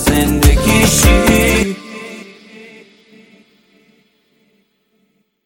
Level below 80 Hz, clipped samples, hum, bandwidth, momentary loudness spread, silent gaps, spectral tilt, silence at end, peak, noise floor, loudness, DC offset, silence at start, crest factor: -20 dBFS; under 0.1%; none; 17 kHz; 20 LU; none; -4 dB/octave; 3.25 s; 0 dBFS; -62 dBFS; -11 LUFS; under 0.1%; 0 s; 16 dB